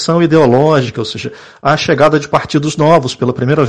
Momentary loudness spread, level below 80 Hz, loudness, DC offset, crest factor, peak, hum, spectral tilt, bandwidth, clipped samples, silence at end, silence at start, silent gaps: 11 LU; -44 dBFS; -12 LUFS; under 0.1%; 12 dB; 0 dBFS; none; -6 dB/octave; 9.8 kHz; under 0.1%; 0 s; 0 s; none